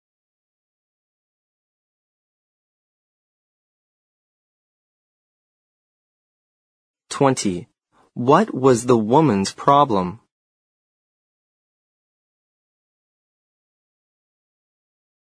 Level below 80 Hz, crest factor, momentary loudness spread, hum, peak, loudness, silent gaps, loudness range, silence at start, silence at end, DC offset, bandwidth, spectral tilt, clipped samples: -64 dBFS; 24 dB; 14 LU; none; 0 dBFS; -18 LUFS; none; 9 LU; 7.1 s; 5.2 s; under 0.1%; 11 kHz; -6 dB/octave; under 0.1%